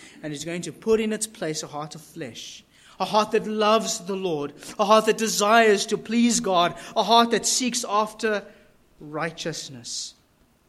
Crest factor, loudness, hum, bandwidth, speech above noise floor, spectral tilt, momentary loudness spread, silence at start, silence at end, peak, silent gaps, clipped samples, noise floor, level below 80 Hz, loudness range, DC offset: 20 dB; -23 LUFS; none; 15 kHz; 38 dB; -3 dB/octave; 17 LU; 0 s; 0.6 s; -4 dBFS; none; under 0.1%; -61 dBFS; -62 dBFS; 7 LU; under 0.1%